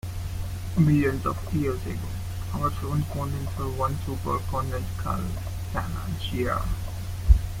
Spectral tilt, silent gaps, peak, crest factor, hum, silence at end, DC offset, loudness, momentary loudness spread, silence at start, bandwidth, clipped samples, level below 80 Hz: -7 dB/octave; none; -4 dBFS; 22 dB; none; 0 s; under 0.1%; -28 LUFS; 10 LU; 0.05 s; 16.5 kHz; under 0.1%; -32 dBFS